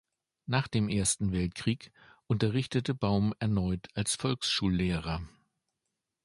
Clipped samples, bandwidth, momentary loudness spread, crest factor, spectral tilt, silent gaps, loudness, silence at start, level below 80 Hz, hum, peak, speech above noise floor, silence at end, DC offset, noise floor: under 0.1%; 11.5 kHz; 7 LU; 20 dB; -5 dB/octave; none; -31 LUFS; 0.5 s; -48 dBFS; none; -12 dBFS; 55 dB; 0.95 s; under 0.1%; -85 dBFS